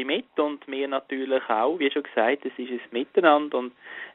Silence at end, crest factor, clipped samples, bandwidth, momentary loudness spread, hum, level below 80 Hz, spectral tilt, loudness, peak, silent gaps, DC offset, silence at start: 0.05 s; 22 dB; under 0.1%; 4.1 kHz; 11 LU; none; -74 dBFS; -1 dB/octave; -25 LUFS; -4 dBFS; none; under 0.1%; 0 s